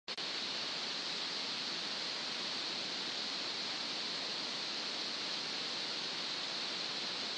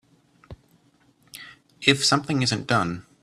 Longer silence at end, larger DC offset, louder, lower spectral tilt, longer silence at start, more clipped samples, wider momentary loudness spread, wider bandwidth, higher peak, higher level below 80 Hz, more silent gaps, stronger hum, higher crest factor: second, 0 s vs 0.2 s; neither; second, -37 LUFS vs -22 LUFS; second, -1 dB/octave vs -3.5 dB/octave; second, 0.1 s vs 0.5 s; neither; second, 0 LU vs 23 LU; second, 10 kHz vs 14.5 kHz; second, -26 dBFS vs -2 dBFS; second, -88 dBFS vs -58 dBFS; neither; neither; second, 14 dB vs 26 dB